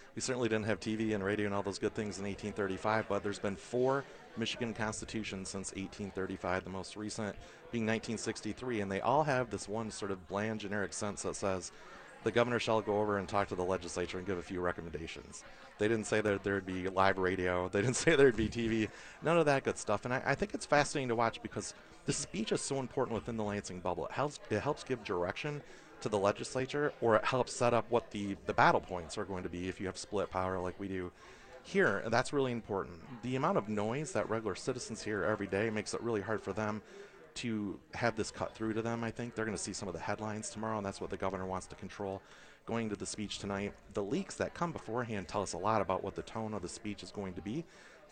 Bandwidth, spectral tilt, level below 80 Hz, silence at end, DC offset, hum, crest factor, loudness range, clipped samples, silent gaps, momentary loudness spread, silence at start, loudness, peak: 9.6 kHz; -5 dB/octave; -60 dBFS; 0.05 s; under 0.1%; none; 24 dB; 7 LU; under 0.1%; none; 11 LU; 0 s; -36 LUFS; -12 dBFS